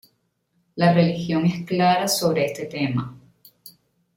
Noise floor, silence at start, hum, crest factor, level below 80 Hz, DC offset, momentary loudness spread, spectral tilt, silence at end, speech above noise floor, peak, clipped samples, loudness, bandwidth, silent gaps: -70 dBFS; 0.75 s; none; 18 dB; -60 dBFS; under 0.1%; 9 LU; -5.5 dB/octave; 0.45 s; 49 dB; -6 dBFS; under 0.1%; -21 LUFS; 16.5 kHz; none